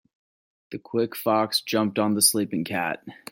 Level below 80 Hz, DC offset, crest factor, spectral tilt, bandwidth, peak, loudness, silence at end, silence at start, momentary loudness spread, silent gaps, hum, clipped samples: -72 dBFS; under 0.1%; 20 dB; -3 dB/octave; 16.5 kHz; -6 dBFS; -23 LUFS; 0.2 s; 0.7 s; 14 LU; none; none; under 0.1%